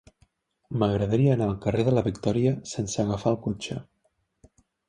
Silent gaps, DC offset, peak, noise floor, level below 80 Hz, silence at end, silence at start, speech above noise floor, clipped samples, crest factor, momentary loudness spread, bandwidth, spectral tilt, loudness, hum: none; under 0.1%; -8 dBFS; -72 dBFS; -50 dBFS; 1.05 s; 0.7 s; 48 dB; under 0.1%; 18 dB; 10 LU; 10.5 kHz; -7 dB/octave; -26 LUFS; none